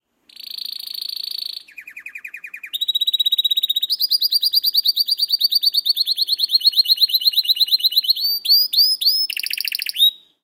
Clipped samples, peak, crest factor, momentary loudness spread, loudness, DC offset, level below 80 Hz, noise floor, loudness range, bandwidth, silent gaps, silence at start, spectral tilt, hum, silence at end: under 0.1%; -2 dBFS; 16 dB; 16 LU; -15 LUFS; under 0.1%; -82 dBFS; -41 dBFS; 6 LU; 17 kHz; none; 0.5 s; 5.5 dB/octave; none; 0.25 s